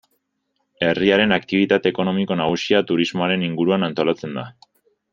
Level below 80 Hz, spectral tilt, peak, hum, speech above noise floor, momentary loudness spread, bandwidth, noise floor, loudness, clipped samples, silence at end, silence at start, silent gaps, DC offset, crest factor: -60 dBFS; -6 dB/octave; -2 dBFS; none; 53 dB; 7 LU; 7.4 kHz; -73 dBFS; -19 LUFS; under 0.1%; 0.6 s; 0.8 s; none; under 0.1%; 18 dB